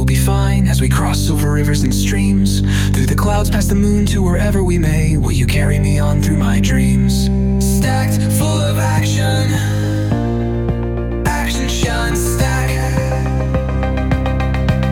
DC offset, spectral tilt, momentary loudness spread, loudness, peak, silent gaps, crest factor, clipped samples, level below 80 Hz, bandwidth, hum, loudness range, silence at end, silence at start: under 0.1%; -6 dB/octave; 4 LU; -15 LUFS; -2 dBFS; none; 12 dB; under 0.1%; -20 dBFS; 17.5 kHz; none; 3 LU; 0 s; 0 s